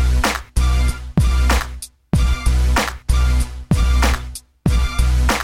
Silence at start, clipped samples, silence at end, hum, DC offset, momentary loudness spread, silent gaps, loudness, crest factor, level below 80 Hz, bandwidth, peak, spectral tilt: 0 s; under 0.1%; 0 s; none; under 0.1%; 5 LU; none; -19 LUFS; 14 dB; -18 dBFS; 16.5 kHz; -4 dBFS; -5 dB/octave